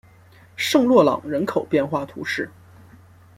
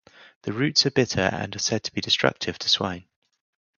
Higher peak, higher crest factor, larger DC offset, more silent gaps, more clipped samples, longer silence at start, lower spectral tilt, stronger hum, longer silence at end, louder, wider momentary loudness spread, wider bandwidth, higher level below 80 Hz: about the same, -2 dBFS vs 0 dBFS; second, 20 dB vs 26 dB; neither; second, none vs 0.36-0.41 s; neither; first, 0.6 s vs 0.2 s; first, -5 dB/octave vs -3.5 dB/octave; neither; first, 0.9 s vs 0.75 s; first, -20 LUFS vs -23 LUFS; about the same, 12 LU vs 11 LU; first, 16.5 kHz vs 7.4 kHz; second, -62 dBFS vs -54 dBFS